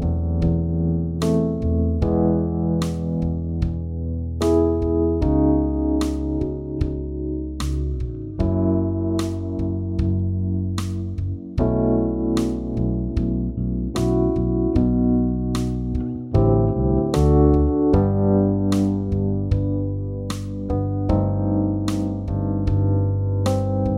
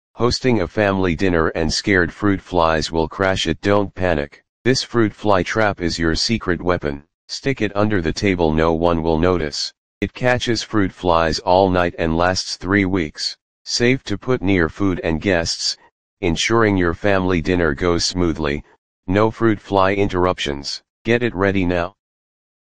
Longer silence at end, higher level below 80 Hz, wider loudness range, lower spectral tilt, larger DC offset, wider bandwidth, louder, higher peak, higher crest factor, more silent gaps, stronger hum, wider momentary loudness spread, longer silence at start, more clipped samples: second, 0 s vs 0.75 s; first, -28 dBFS vs -38 dBFS; first, 5 LU vs 2 LU; first, -8.5 dB/octave vs -5 dB/octave; second, under 0.1% vs 2%; first, 13 kHz vs 10 kHz; second, -22 LUFS vs -19 LUFS; second, -4 dBFS vs 0 dBFS; about the same, 16 dB vs 18 dB; second, none vs 4.49-4.65 s, 7.14-7.28 s, 9.78-10.01 s, 13.42-13.65 s, 15.92-16.17 s, 18.78-19.03 s, 20.90-21.05 s; neither; about the same, 8 LU vs 7 LU; second, 0 s vs 0.15 s; neither